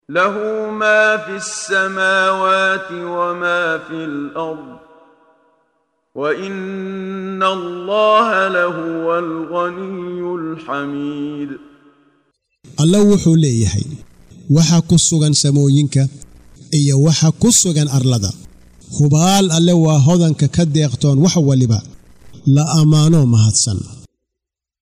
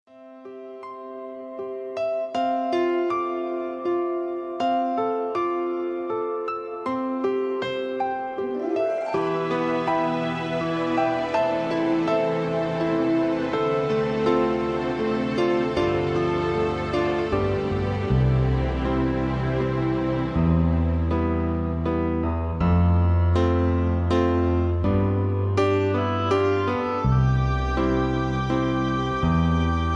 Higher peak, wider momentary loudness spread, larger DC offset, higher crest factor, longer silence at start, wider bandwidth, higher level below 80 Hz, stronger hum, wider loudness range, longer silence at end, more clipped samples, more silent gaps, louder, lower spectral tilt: first, -2 dBFS vs -8 dBFS; first, 13 LU vs 7 LU; neither; about the same, 14 dB vs 14 dB; about the same, 0.1 s vs 0.15 s; first, 15.5 kHz vs 7.6 kHz; second, -46 dBFS vs -34 dBFS; neither; first, 10 LU vs 4 LU; first, 0.85 s vs 0 s; neither; neither; first, -15 LUFS vs -24 LUFS; second, -5 dB/octave vs -8 dB/octave